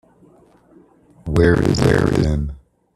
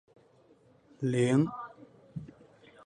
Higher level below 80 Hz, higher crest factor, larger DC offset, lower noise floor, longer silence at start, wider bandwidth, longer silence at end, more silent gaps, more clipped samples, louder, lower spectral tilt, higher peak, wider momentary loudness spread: first, -32 dBFS vs -68 dBFS; about the same, 18 dB vs 20 dB; neither; second, -51 dBFS vs -63 dBFS; first, 1.25 s vs 1 s; first, 13 kHz vs 10 kHz; second, 0.4 s vs 0.6 s; neither; neither; first, -17 LUFS vs -29 LUFS; about the same, -7 dB/octave vs -7 dB/octave; first, 0 dBFS vs -14 dBFS; second, 12 LU vs 20 LU